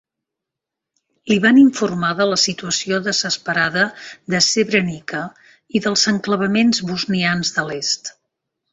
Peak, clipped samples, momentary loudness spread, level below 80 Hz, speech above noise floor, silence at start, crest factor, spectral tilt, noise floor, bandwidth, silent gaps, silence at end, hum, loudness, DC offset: -2 dBFS; under 0.1%; 10 LU; -58 dBFS; 66 dB; 1.25 s; 16 dB; -3.5 dB/octave; -84 dBFS; 8.4 kHz; none; 0.6 s; none; -17 LUFS; under 0.1%